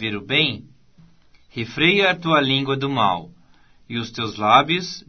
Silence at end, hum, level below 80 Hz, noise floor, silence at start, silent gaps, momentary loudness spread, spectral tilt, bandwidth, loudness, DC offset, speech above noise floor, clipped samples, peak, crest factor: 0.1 s; none; -56 dBFS; -55 dBFS; 0 s; none; 14 LU; -5 dB/octave; 6.6 kHz; -19 LUFS; 0.2%; 35 dB; under 0.1%; 0 dBFS; 22 dB